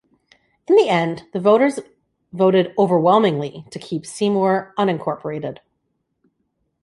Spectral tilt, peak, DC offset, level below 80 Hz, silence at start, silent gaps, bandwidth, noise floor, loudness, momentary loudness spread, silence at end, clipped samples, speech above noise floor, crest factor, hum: -6.5 dB/octave; -2 dBFS; under 0.1%; -64 dBFS; 0.7 s; none; 11.5 kHz; -72 dBFS; -18 LUFS; 14 LU; 1.3 s; under 0.1%; 54 dB; 18 dB; none